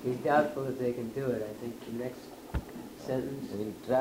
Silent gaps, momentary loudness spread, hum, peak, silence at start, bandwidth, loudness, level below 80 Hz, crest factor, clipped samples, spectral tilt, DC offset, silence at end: none; 13 LU; none; -12 dBFS; 0 s; 16 kHz; -34 LUFS; -50 dBFS; 20 dB; under 0.1%; -6.5 dB/octave; under 0.1%; 0 s